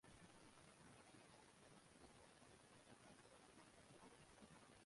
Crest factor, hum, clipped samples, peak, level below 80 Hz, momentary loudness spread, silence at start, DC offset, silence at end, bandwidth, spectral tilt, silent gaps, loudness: 16 dB; none; under 0.1%; -52 dBFS; -84 dBFS; 1 LU; 0.05 s; under 0.1%; 0 s; 11.5 kHz; -3.5 dB/octave; none; -67 LUFS